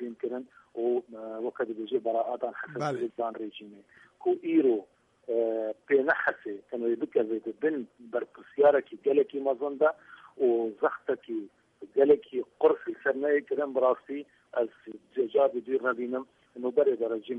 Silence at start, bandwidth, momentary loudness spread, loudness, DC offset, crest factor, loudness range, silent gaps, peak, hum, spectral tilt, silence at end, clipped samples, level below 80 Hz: 0 s; 6.2 kHz; 13 LU; -29 LUFS; under 0.1%; 18 dB; 5 LU; none; -10 dBFS; none; -7 dB/octave; 0 s; under 0.1%; -78 dBFS